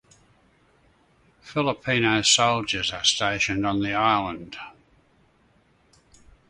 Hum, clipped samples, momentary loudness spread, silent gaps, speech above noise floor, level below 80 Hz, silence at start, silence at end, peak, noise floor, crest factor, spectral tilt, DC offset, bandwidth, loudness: none; under 0.1%; 17 LU; none; 38 dB; -54 dBFS; 1.45 s; 1.8 s; -4 dBFS; -62 dBFS; 22 dB; -2.5 dB/octave; under 0.1%; 11.5 kHz; -22 LUFS